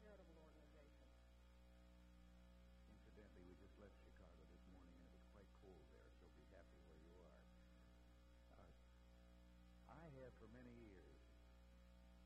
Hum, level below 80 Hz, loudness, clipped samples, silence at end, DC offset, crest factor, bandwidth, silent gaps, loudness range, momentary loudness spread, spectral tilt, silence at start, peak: 60 Hz at -70 dBFS; -70 dBFS; -67 LUFS; under 0.1%; 0 s; under 0.1%; 16 dB; 12 kHz; none; 3 LU; 6 LU; -6.5 dB/octave; 0 s; -50 dBFS